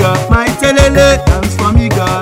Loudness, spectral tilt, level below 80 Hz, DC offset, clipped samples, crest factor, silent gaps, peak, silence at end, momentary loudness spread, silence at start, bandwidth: -10 LUFS; -5.5 dB/octave; -16 dBFS; under 0.1%; 2%; 10 dB; none; 0 dBFS; 0 s; 5 LU; 0 s; 16.5 kHz